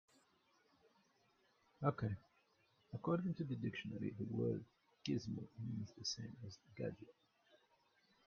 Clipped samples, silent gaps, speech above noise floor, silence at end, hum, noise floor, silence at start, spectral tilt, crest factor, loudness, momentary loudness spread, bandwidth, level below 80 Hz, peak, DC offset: under 0.1%; none; 33 dB; 0.7 s; none; -77 dBFS; 1.8 s; -6 dB/octave; 24 dB; -45 LUFS; 12 LU; 7.2 kHz; -76 dBFS; -24 dBFS; under 0.1%